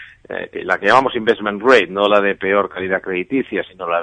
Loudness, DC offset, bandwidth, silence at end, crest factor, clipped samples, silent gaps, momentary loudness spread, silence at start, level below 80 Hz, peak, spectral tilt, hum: -16 LUFS; under 0.1%; 9.4 kHz; 0 s; 16 dB; under 0.1%; none; 12 LU; 0 s; -56 dBFS; 0 dBFS; -5 dB/octave; none